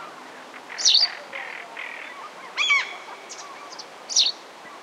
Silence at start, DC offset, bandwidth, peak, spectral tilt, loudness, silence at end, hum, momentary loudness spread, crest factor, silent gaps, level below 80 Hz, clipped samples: 0 s; under 0.1%; 16 kHz; -6 dBFS; 3 dB/octave; -21 LUFS; 0 s; none; 22 LU; 22 dB; none; -90 dBFS; under 0.1%